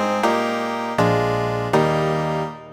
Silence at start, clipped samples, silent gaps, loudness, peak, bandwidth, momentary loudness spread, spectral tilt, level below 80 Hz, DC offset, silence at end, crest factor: 0 s; under 0.1%; none; -20 LUFS; -4 dBFS; 17.5 kHz; 5 LU; -6 dB/octave; -48 dBFS; under 0.1%; 0 s; 16 dB